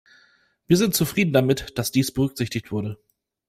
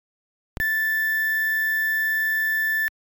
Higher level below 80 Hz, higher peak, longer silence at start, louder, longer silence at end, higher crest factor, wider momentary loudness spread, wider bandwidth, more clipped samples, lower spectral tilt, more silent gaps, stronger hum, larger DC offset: about the same, -50 dBFS vs -52 dBFS; first, -4 dBFS vs -14 dBFS; about the same, 0.7 s vs 0.6 s; about the same, -22 LUFS vs -21 LUFS; first, 0.55 s vs 0.3 s; first, 18 dB vs 10 dB; first, 10 LU vs 2 LU; second, 16 kHz vs over 20 kHz; neither; first, -5 dB/octave vs -0.5 dB/octave; neither; neither; neither